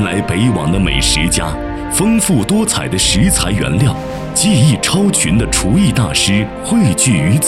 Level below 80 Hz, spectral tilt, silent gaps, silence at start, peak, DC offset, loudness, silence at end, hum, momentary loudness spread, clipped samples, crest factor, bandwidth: -26 dBFS; -4 dB/octave; none; 0 s; 0 dBFS; under 0.1%; -13 LUFS; 0 s; none; 5 LU; under 0.1%; 12 dB; 15.5 kHz